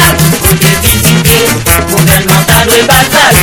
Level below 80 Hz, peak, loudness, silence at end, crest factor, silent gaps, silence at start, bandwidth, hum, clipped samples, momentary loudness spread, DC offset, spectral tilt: -20 dBFS; 0 dBFS; -5 LUFS; 0 s; 6 dB; none; 0 s; over 20 kHz; none; 0.5%; 2 LU; under 0.1%; -3.5 dB/octave